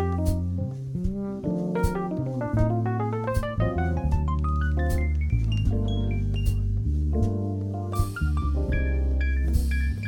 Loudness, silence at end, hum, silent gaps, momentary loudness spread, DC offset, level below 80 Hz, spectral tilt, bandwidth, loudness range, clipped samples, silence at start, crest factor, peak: -27 LUFS; 0 s; none; none; 4 LU; under 0.1%; -28 dBFS; -8 dB/octave; 18 kHz; 1 LU; under 0.1%; 0 s; 14 dB; -10 dBFS